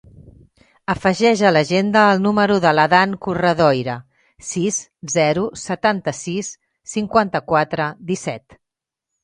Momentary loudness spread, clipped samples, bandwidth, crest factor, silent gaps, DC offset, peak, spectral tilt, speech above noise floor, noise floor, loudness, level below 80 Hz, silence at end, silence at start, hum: 13 LU; under 0.1%; 10.5 kHz; 18 dB; none; under 0.1%; 0 dBFS; -4.5 dB/octave; 66 dB; -83 dBFS; -18 LUFS; -52 dBFS; 0.85 s; 0.25 s; none